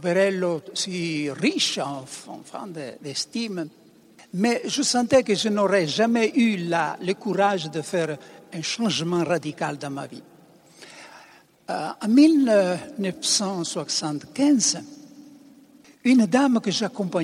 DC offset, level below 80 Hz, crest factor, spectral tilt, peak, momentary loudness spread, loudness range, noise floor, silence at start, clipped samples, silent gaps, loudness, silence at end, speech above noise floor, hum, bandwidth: under 0.1%; -68 dBFS; 18 dB; -4 dB/octave; -4 dBFS; 16 LU; 7 LU; -52 dBFS; 0 s; under 0.1%; none; -23 LUFS; 0 s; 29 dB; none; 14 kHz